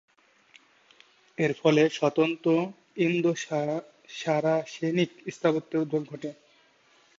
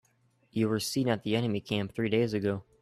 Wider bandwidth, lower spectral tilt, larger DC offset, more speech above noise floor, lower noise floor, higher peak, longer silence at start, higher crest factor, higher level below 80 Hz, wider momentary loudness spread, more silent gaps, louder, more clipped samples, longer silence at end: second, 7.8 kHz vs 14.5 kHz; about the same, -6 dB/octave vs -5.5 dB/octave; neither; about the same, 36 dB vs 39 dB; second, -62 dBFS vs -69 dBFS; first, -10 dBFS vs -14 dBFS; first, 1.4 s vs 0.55 s; about the same, 18 dB vs 16 dB; second, -76 dBFS vs -64 dBFS; first, 13 LU vs 5 LU; neither; first, -27 LUFS vs -30 LUFS; neither; first, 0.85 s vs 0.2 s